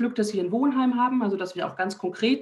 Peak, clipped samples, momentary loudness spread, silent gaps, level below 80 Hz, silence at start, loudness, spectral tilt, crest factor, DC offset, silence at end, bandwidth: -12 dBFS; under 0.1%; 6 LU; none; -72 dBFS; 0 s; -25 LUFS; -5.5 dB/octave; 14 dB; under 0.1%; 0 s; 12 kHz